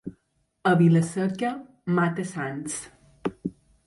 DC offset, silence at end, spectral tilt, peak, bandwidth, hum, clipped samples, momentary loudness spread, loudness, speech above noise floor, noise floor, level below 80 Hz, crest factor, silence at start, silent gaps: under 0.1%; 0.35 s; -6.5 dB/octave; -10 dBFS; 11.5 kHz; none; under 0.1%; 17 LU; -25 LUFS; 47 dB; -70 dBFS; -62 dBFS; 16 dB; 0.05 s; none